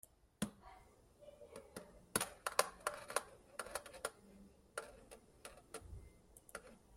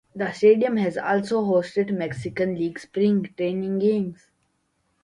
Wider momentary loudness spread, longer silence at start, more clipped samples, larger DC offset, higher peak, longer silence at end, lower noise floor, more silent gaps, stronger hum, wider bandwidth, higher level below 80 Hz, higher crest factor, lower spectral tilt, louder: first, 24 LU vs 10 LU; about the same, 0.05 s vs 0.15 s; neither; neither; second, -12 dBFS vs -6 dBFS; second, 0 s vs 0.9 s; second, -65 dBFS vs -71 dBFS; neither; neither; first, 16 kHz vs 10.5 kHz; about the same, -68 dBFS vs -64 dBFS; first, 36 dB vs 16 dB; second, -2 dB/octave vs -7.5 dB/octave; second, -45 LUFS vs -23 LUFS